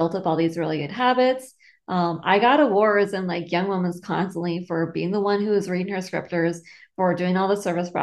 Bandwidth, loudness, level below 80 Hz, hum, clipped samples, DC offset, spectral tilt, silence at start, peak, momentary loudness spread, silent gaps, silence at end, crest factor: 12.5 kHz; -23 LUFS; -68 dBFS; none; under 0.1%; under 0.1%; -6.5 dB/octave; 0 s; -4 dBFS; 9 LU; none; 0 s; 18 dB